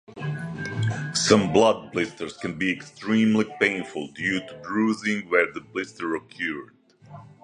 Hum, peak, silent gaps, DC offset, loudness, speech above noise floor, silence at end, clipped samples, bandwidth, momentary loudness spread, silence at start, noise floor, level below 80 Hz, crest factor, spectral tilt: none; -2 dBFS; none; under 0.1%; -25 LUFS; 22 dB; 0.15 s; under 0.1%; 11.5 kHz; 12 LU; 0.1 s; -46 dBFS; -58 dBFS; 22 dB; -4.5 dB/octave